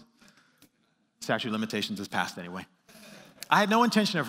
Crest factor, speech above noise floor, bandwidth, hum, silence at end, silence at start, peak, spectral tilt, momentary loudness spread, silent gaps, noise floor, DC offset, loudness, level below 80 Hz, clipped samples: 24 dB; 44 dB; 16 kHz; none; 0 s; 1.2 s; -8 dBFS; -4.5 dB/octave; 19 LU; none; -71 dBFS; under 0.1%; -27 LUFS; -78 dBFS; under 0.1%